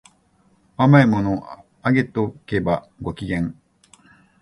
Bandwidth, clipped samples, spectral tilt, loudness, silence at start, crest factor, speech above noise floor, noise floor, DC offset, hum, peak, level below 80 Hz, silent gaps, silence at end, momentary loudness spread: 10.5 kHz; under 0.1%; -8.5 dB/octave; -20 LUFS; 0.8 s; 20 dB; 41 dB; -60 dBFS; under 0.1%; none; 0 dBFS; -46 dBFS; none; 0.9 s; 16 LU